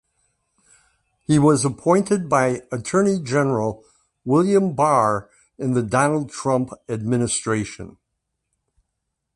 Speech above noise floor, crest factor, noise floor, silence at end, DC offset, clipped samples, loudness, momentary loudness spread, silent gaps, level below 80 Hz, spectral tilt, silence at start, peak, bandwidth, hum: 58 dB; 18 dB; -78 dBFS; 1.45 s; under 0.1%; under 0.1%; -20 LUFS; 11 LU; none; -54 dBFS; -6 dB/octave; 1.3 s; -2 dBFS; 11.5 kHz; none